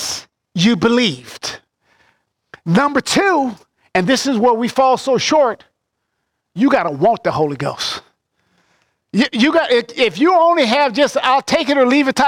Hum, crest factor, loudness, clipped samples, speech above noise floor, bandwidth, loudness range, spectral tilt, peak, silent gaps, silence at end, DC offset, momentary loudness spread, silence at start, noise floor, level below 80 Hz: none; 14 dB; -15 LUFS; under 0.1%; 59 dB; 16.5 kHz; 4 LU; -4.5 dB/octave; -2 dBFS; none; 0 s; under 0.1%; 13 LU; 0 s; -73 dBFS; -54 dBFS